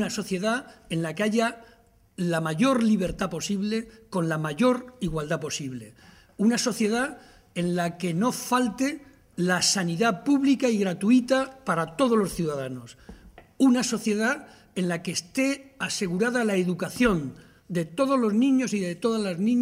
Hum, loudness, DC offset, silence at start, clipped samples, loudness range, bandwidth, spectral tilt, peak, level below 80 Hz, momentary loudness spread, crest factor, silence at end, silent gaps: none; -25 LUFS; under 0.1%; 0 s; under 0.1%; 4 LU; 16 kHz; -5 dB/octave; -8 dBFS; -54 dBFS; 10 LU; 18 dB; 0 s; none